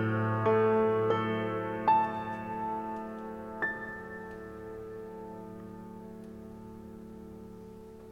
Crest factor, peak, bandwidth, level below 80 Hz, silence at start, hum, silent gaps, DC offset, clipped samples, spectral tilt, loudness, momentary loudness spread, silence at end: 18 dB; -14 dBFS; 8 kHz; -62 dBFS; 0 s; none; none; under 0.1%; under 0.1%; -8 dB/octave; -31 LUFS; 20 LU; 0 s